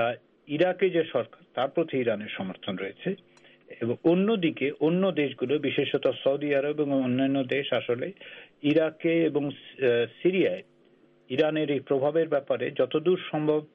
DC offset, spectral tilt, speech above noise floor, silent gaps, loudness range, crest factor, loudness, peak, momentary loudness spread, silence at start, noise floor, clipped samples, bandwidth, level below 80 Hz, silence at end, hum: under 0.1%; -5 dB/octave; 34 dB; none; 3 LU; 16 dB; -27 LUFS; -12 dBFS; 10 LU; 0 s; -60 dBFS; under 0.1%; 5.4 kHz; -74 dBFS; 0.1 s; none